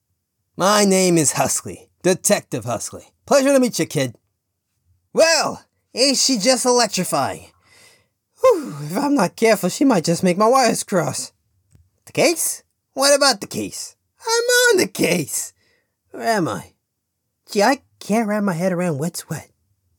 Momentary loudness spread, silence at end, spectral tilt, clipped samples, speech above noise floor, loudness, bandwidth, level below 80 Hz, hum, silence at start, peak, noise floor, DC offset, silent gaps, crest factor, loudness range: 14 LU; 0.55 s; -3.5 dB/octave; under 0.1%; 57 dB; -18 LUFS; 19 kHz; -66 dBFS; none; 0.6 s; -2 dBFS; -75 dBFS; under 0.1%; none; 16 dB; 4 LU